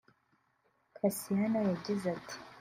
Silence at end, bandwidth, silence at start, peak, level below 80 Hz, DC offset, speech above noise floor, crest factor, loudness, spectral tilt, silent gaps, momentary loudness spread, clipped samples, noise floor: 0 s; 16 kHz; 1.05 s; -16 dBFS; -72 dBFS; under 0.1%; 42 dB; 18 dB; -34 LUFS; -6 dB/octave; none; 9 LU; under 0.1%; -75 dBFS